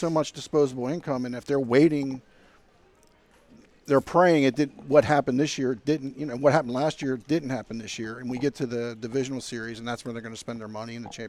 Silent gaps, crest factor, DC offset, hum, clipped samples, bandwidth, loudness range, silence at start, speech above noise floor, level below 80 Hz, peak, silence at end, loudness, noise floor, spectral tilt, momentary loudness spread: none; 20 dB; under 0.1%; none; under 0.1%; 13 kHz; 8 LU; 0 s; 34 dB; -60 dBFS; -6 dBFS; 0 s; -26 LUFS; -59 dBFS; -6 dB/octave; 15 LU